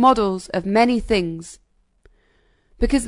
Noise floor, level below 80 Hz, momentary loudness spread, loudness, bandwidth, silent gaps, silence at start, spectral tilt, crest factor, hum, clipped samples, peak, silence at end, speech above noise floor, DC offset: -61 dBFS; -36 dBFS; 14 LU; -20 LUFS; 11 kHz; none; 0 s; -5.5 dB/octave; 18 dB; none; under 0.1%; -2 dBFS; 0 s; 42 dB; under 0.1%